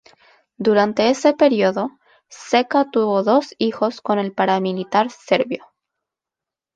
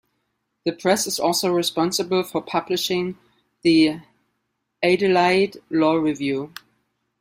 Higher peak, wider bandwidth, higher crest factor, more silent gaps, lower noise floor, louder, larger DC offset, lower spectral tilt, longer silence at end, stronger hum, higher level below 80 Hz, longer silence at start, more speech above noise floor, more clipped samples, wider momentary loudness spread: about the same, -2 dBFS vs -4 dBFS; second, 9.2 kHz vs 16 kHz; about the same, 18 dB vs 18 dB; neither; first, -87 dBFS vs -75 dBFS; about the same, -19 LUFS vs -21 LUFS; neither; first, -5.5 dB/octave vs -4 dB/octave; first, 1.2 s vs 0.7 s; neither; about the same, -66 dBFS vs -62 dBFS; about the same, 0.6 s vs 0.65 s; first, 69 dB vs 55 dB; neither; about the same, 8 LU vs 10 LU